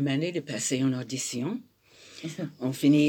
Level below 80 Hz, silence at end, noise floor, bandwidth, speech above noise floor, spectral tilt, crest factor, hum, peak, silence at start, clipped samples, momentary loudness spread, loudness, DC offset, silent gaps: -76 dBFS; 0 s; -52 dBFS; 18.5 kHz; 25 dB; -5 dB/octave; 16 dB; none; -12 dBFS; 0 s; under 0.1%; 13 LU; -30 LUFS; under 0.1%; none